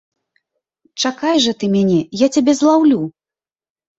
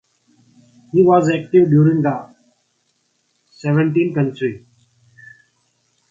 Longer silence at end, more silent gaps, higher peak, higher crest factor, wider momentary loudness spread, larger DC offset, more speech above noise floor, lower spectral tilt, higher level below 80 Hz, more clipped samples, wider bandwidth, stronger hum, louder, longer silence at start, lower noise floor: second, 0.9 s vs 1.55 s; neither; about the same, -2 dBFS vs 0 dBFS; about the same, 16 dB vs 18 dB; second, 8 LU vs 12 LU; neither; first, over 76 dB vs 51 dB; second, -5 dB/octave vs -8.5 dB/octave; about the same, -58 dBFS vs -60 dBFS; neither; first, 8.2 kHz vs 7.4 kHz; neither; about the same, -15 LUFS vs -16 LUFS; about the same, 0.95 s vs 0.95 s; first, under -90 dBFS vs -66 dBFS